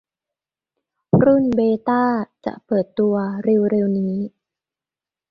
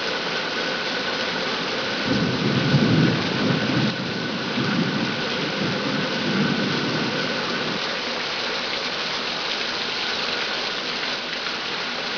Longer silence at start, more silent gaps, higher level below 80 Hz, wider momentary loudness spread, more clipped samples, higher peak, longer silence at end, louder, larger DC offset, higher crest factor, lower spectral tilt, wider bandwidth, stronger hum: first, 1.15 s vs 0 s; neither; about the same, -54 dBFS vs -56 dBFS; first, 11 LU vs 4 LU; neither; first, -2 dBFS vs -6 dBFS; first, 1.05 s vs 0 s; first, -19 LUFS vs -23 LUFS; neither; about the same, 18 dB vs 18 dB; first, -10.5 dB/octave vs -4.5 dB/octave; about the same, 5.2 kHz vs 5.4 kHz; neither